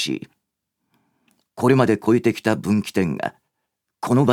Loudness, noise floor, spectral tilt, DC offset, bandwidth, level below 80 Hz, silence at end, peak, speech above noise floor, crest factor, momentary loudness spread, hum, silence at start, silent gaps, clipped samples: -20 LUFS; -79 dBFS; -6.5 dB/octave; under 0.1%; 16.5 kHz; -60 dBFS; 0 s; 0 dBFS; 60 dB; 20 dB; 12 LU; none; 0 s; none; under 0.1%